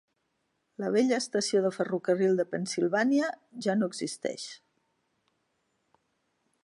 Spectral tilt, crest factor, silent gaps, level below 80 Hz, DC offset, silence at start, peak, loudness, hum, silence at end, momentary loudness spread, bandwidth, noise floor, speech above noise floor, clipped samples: -4.5 dB/octave; 16 dB; none; -82 dBFS; under 0.1%; 0.8 s; -14 dBFS; -29 LUFS; none; 2.1 s; 9 LU; 11.5 kHz; -78 dBFS; 49 dB; under 0.1%